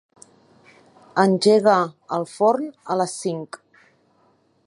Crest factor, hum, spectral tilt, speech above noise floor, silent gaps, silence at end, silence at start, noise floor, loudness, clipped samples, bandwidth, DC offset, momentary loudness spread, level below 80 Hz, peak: 20 dB; none; -5 dB/octave; 42 dB; none; 1.1 s; 1.15 s; -61 dBFS; -20 LUFS; under 0.1%; 11.5 kHz; under 0.1%; 14 LU; -76 dBFS; -2 dBFS